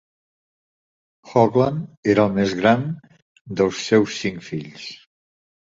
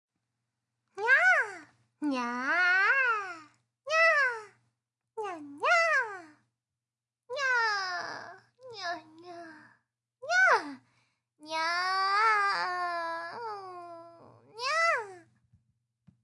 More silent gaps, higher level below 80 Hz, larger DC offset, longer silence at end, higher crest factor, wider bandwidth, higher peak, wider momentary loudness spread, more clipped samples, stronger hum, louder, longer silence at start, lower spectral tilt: first, 1.97-2.03 s, 3.22-3.35 s, 3.41-3.45 s vs none; first, -56 dBFS vs under -90 dBFS; neither; second, 0.7 s vs 1.05 s; about the same, 20 dB vs 20 dB; second, 7.8 kHz vs 11.5 kHz; first, -2 dBFS vs -12 dBFS; second, 15 LU vs 23 LU; neither; neither; first, -20 LUFS vs -27 LUFS; first, 1.25 s vs 0.95 s; first, -6 dB/octave vs -1.5 dB/octave